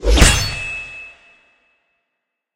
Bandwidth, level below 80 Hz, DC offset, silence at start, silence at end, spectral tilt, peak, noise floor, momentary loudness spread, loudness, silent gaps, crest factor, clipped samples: 16 kHz; -22 dBFS; under 0.1%; 0 s; 1.45 s; -3 dB/octave; 0 dBFS; -77 dBFS; 22 LU; -16 LUFS; none; 18 dB; under 0.1%